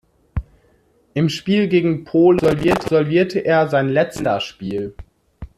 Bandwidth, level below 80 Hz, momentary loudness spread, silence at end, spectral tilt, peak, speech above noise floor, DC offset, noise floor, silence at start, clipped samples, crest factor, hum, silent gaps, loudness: 13.5 kHz; -40 dBFS; 15 LU; 0.15 s; -7 dB/octave; -2 dBFS; 41 dB; under 0.1%; -57 dBFS; 0.35 s; under 0.1%; 16 dB; none; none; -18 LUFS